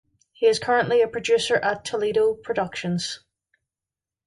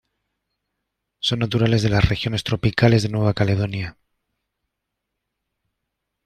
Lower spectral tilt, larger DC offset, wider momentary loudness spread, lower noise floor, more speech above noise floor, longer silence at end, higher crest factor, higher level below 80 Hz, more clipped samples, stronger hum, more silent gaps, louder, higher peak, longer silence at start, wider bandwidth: second, -4 dB/octave vs -6.5 dB/octave; neither; about the same, 7 LU vs 8 LU; first, -90 dBFS vs -80 dBFS; first, 68 dB vs 61 dB; second, 1.1 s vs 2.35 s; about the same, 18 dB vs 20 dB; second, -62 dBFS vs -40 dBFS; neither; neither; neither; second, -23 LUFS vs -20 LUFS; second, -6 dBFS vs -2 dBFS; second, 0.4 s vs 1.25 s; first, 11.5 kHz vs 9.8 kHz